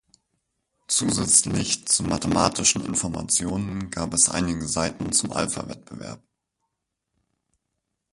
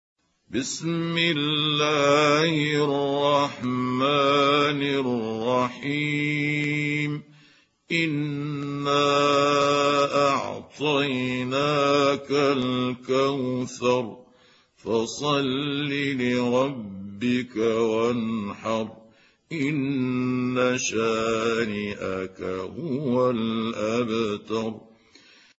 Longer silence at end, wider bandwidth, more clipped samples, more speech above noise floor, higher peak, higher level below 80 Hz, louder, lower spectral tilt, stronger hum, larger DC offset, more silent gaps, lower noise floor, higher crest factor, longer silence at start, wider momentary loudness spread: first, 1.95 s vs 0.8 s; first, 11.5 kHz vs 8 kHz; neither; first, 56 dB vs 34 dB; first, -2 dBFS vs -8 dBFS; first, -48 dBFS vs -64 dBFS; about the same, -22 LUFS vs -24 LUFS; second, -3 dB/octave vs -5 dB/octave; neither; neither; neither; first, -80 dBFS vs -58 dBFS; first, 24 dB vs 16 dB; first, 0.9 s vs 0.5 s; first, 14 LU vs 10 LU